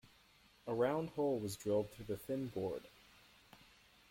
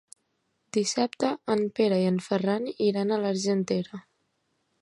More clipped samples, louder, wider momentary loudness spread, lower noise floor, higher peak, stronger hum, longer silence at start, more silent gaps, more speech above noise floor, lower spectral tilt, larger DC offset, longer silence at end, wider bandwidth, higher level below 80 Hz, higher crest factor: neither; second, -40 LUFS vs -27 LUFS; first, 11 LU vs 6 LU; second, -68 dBFS vs -75 dBFS; second, -24 dBFS vs -10 dBFS; neither; about the same, 0.65 s vs 0.75 s; neither; second, 29 dB vs 49 dB; about the same, -6 dB/octave vs -5.5 dB/octave; neither; second, 0.55 s vs 0.8 s; first, 16.5 kHz vs 11.5 kHz; about the same, -70 dBFS vs -72 dBFS; about the same, 18 dB vs 18 dB